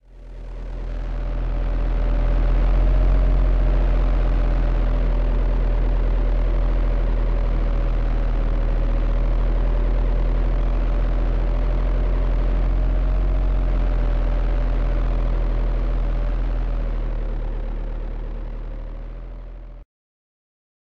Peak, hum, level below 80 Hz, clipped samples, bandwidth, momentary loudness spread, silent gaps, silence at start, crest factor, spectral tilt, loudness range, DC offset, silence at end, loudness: -8 dBFS; none; -20 dBFS; under 0.1%; 4.2 kHz; 12 LU; none; 0 s; 10 dB; -9 dB/octave; 7 LU; 0.7%; 1 s; -24 LUFS